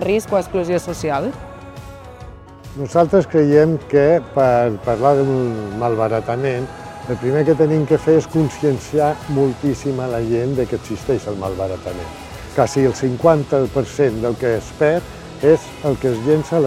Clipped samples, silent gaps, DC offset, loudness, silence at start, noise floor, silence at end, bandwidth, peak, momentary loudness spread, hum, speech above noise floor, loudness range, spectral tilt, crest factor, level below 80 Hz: under 0.1%; none; under 0.1%; -18 LUFS; 0 s; -37 dBFS; 0 s; 14.5 kHz; 0 dBFS; 15 LU; none; 20 dB; 5 LU; -7 dB/octave; 18 dB; -42 dBFS